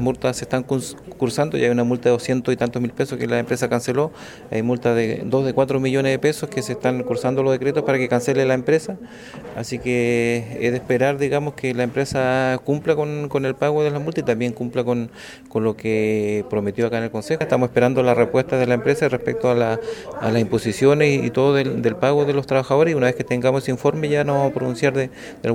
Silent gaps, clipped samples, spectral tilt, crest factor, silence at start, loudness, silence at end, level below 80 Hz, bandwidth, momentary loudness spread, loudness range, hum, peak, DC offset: none; under 0.1%; -6.5 dB/octave; 18 dB; 0 s; -20 LUFS; 0 s; -52 dBFS; 16 kHz; 7 LU; 3 LU; none; -2 dBFS; under 0.1%